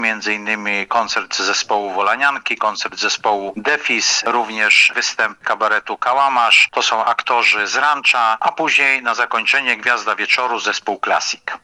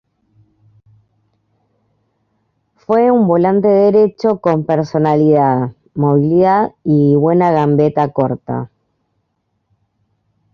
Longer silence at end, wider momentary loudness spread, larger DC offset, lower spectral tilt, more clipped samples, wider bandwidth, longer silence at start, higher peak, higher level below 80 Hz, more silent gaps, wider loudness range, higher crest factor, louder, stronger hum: second, 0.05 s vs 1.9 s; about the same, 8 LU vs 7 LU; neither; second, 0 dB/octave vs -10 dB/octave; neither; first, 11.5 kHz vs 6.6 kHz; second, 0 s vs 2.9 s; about the same, 0 dBFS vs -2 dBFS; second, -66 dBFS vs -54 dBFS; neither; about the same, 4 LU vs 5 LU; about the same, 18 dB vs 14 dB; about the same, -15 LUFS vs -13 LUFS; neither